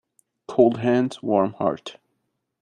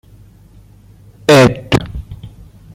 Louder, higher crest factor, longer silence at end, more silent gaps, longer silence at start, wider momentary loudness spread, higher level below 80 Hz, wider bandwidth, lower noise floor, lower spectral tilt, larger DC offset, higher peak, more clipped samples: second, -22 LUFS vs -12 LUFS; about the same, 20 dB vs 16 dB; first, 0.7 s vs 0.45 s; neither; second, 0.5 s vs 1.3 s; second, 12 LU vs 24 LU; second, -66 dBFS vs -36 dBFS; second, 10 kHz vs 16.5 kHz; first, -76 dBFS vs -42 dBFS; first, -7.5 dB/octave vs -5.5 dB/octave; neither; second, -4 dBFS vs 0 dBFS; neither